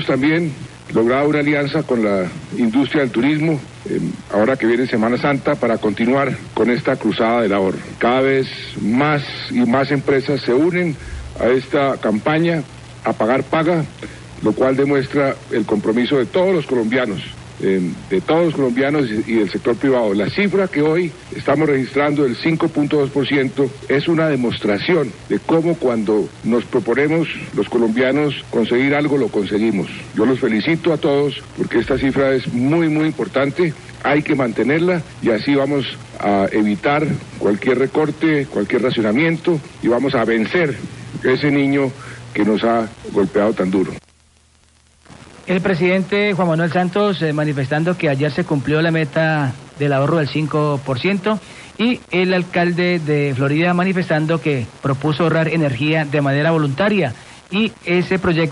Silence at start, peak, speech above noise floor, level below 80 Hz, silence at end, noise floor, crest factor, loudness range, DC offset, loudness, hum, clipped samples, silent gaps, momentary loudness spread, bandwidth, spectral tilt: 0 s; -6 dBFS; 36 dB; -48 dBFS; 0 s; -53 dBFS; 12 dB; 1 LU; under 0.1%; -17 LUFS; none; under 0.1%; none; 6 LU; 11.5 kHz; -7 dB/octave